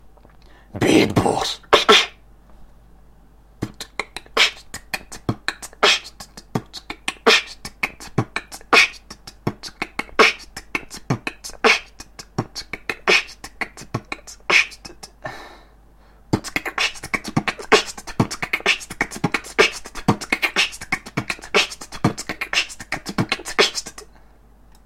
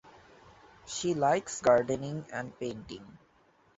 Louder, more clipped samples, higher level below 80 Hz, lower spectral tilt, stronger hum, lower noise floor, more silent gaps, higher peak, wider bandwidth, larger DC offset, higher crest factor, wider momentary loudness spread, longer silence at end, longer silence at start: first, -20 LUFS vs -30 LUFS; neither; first, -46 dBFS vs -64 dBFS; second, -3 dB/octave vs -4.5 dB/octave; neither; second, -49 dBFS vs -65 dBFS; neither; first, 0 dBFS vs -10 dBFS; first, 16.5 kHz vs 8 kHz; neither; about the same, 22 dB vs 22 dB; about the same, 18 LU vs 17 LU; first, 0.8 s vs 0.65 s; first, 0.75 s vs 0.05 s